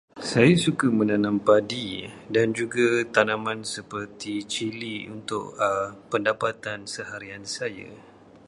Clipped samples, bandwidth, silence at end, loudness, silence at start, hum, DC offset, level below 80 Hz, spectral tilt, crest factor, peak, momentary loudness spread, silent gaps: under 0.1%; 11.5 kHz; 0.45 s; -25 LUFS; 0.15 s; none; under 0.1%; -60 dBFS; -5 dB/octave; 22 dB; -2 dBFS; 14 LU; none